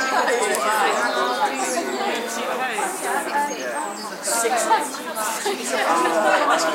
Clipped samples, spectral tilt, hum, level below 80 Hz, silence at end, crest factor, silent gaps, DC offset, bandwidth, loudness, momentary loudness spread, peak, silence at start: under 0.1%; -1 dB/octave; none; -82 dBFS; 0 s; 20 dB; none; under 0.1%; 16 kHz; -21 LUFS; 7 LU; -2 dBFS; 0 s